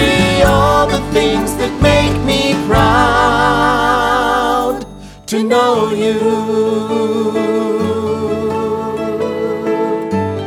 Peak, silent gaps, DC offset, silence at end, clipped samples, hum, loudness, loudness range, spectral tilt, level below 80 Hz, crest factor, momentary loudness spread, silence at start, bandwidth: 0 dBFS; none; under 0.1%; 0 s; under 0.1%; none; -14 LUFS; 5 LU; -5 dB/octave; -30 dBFS; 14 dB; 8 LU; 0 s; 17 kHz